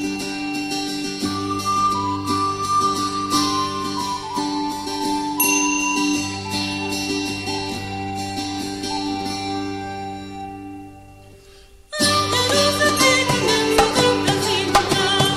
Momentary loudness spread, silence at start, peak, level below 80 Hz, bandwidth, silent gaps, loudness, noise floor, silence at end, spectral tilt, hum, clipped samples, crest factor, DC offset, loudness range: 11 LU; 0 s; -2 dBFS; -46 dBFS; 16 kHz; none; -20 LUFS; -46 dBFS; 0 s; -3 dB/octave; none; under 0.1%; 20 dB; under 0.1%; 10 LU